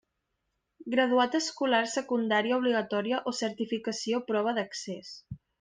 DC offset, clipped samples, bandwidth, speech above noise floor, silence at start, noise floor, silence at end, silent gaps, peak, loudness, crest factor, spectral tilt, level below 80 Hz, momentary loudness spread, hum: under 0.1%; under 0.1%; 10 kHz; 52 dB; 0.8 s; -81 dBFS; 0.25 s; none; -12 dBFS; -29 LUFS; 18 dB; -3.5 dB/octave; -70 dBFS; 14 LU; none